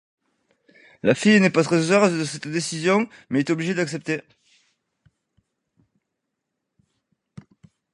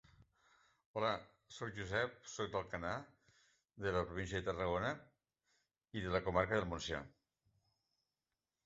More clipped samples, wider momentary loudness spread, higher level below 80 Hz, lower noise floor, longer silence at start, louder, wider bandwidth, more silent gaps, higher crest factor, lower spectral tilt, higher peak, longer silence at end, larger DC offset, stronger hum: neither; about the same, 10 LU vs 12 LU; second, -68 dBFS vs -60 dBFS; second, -80 dBFS vs under -90 dBFS; about the same, 1.05 s vs 0.95 s; first, -21 LUFS vs -41 LUFS; first, 11.5 kHz vs 8 kHz; neither; about the same, 22 dB vs 24 dB; about the same, -5 dB/octave vs -4 dB/octave; first, -2 dBFS vs -18 dBFS; first, 3.75 s vs 1.55 s; neither; neither